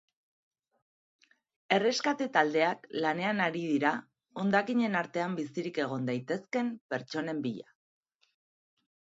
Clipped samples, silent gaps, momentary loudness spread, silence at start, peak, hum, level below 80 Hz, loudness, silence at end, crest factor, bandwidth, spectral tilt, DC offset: under 0.1%; 6.81-6.89 s; 8 LU; 1.7 s; -8 dBFS; none; -80 dBFS; -31 LUFS; 1.55 s; 24 dB; 8 kHz; -5 dB/octave; under 0.1%